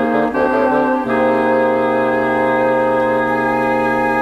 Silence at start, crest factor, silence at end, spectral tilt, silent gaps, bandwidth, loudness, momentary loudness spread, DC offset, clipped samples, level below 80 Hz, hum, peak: 0 s; 12 dB; 0 s; -7 dB/octave; none; 12.5 kHz; -15 LUFS; 1 LU; under 0.1%; under 0.1%; -46 dBFS; none; -4 dBFS